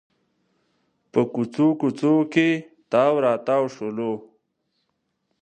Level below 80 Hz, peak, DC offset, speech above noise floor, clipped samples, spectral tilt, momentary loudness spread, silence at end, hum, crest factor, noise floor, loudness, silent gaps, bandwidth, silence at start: -74 dBFS; -4 dBFS; under 0.1%; 54 dB; under 0.1%; -7 dB/octave; 9 LU; 1.25 s; none; 20 dB; -74 dBFS; -22 LUFS; none; 9 kHz; 1.15 s